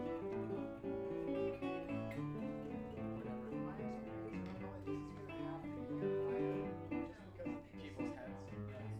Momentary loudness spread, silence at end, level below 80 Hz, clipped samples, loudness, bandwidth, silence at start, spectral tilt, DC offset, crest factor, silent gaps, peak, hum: 8 LU; 0 s; -64 dBFS; under 0.1%; -45 LUFS; 10 kHz; 0 s; -8.5 dB/octave; under 0.1%; 16 dB; none; -28 dBFS; none